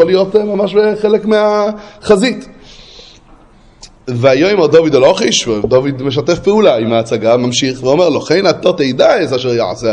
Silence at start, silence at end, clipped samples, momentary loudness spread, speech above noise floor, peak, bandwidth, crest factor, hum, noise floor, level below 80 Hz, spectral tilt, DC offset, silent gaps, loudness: 0 s; 0 s; 0.1%; 6 LU; 31 dB; 0 dBFS; 11 kHz; 12 dB; none; -42 dBFS; -44 dBFS; -5 dB/octave; under 0.1%; none; -11 LUFS